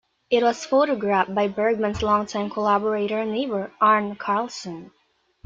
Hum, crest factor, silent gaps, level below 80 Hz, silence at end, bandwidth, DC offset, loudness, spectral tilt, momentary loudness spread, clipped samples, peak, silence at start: none; 18 dB; none; -54 dBFS; 0.6 s; 7.8 kHz; under 0.1%; -22 LUFS; -5 dB/octave; 8 LU; under 0.1%; -4 dBFS; 0.3 s